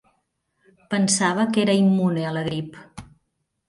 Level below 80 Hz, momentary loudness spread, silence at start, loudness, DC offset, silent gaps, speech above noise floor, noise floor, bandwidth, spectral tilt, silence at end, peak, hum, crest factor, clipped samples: -60 dBFS; 13 LU; 0.9 s; -21 LUFS; under 0.1%; none; 54 dB; -75 dBFS; 11.5 kHz; -5 dB/octave; 0.65 s; -8 dBFS; none; 16 dB; under 0.1%